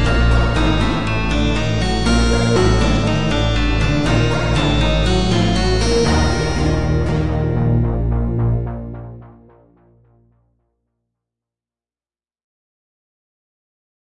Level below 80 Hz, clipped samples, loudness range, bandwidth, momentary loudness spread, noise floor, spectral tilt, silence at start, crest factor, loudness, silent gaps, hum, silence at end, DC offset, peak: -22 dBFS; under 0.1%; 8 LU; 11 kHz; 4 LU; under -90 dBFS; -6 dB/octave; 0 s; 14 dB; -17 LUFS; none; none; 1.65 s; under 0.1%; -4 dBFS